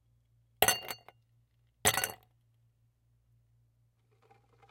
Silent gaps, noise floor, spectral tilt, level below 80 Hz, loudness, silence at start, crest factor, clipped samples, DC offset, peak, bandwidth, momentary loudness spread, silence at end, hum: none; -71 dBFS; -1 dB/octave; -64 dBFS; -30 LUFS; 0.6 s; 32 dB; under 0.1%; under 0.1%; -6 dBFS; 17 kHz; 15 LU; 2.55 s; none